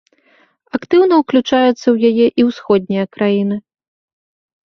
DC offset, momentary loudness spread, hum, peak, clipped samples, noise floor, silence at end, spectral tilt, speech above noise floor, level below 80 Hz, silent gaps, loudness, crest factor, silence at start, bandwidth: under 0.1%; 9 LU; none; -2 dBFS; under 0.1%; -54 dBFS; 1.1 s; -6.5 dB/octave; 41 dB; -58 dBFS; none; -14 LUFS; 14 dB; 0.75 s; 6.6 kHz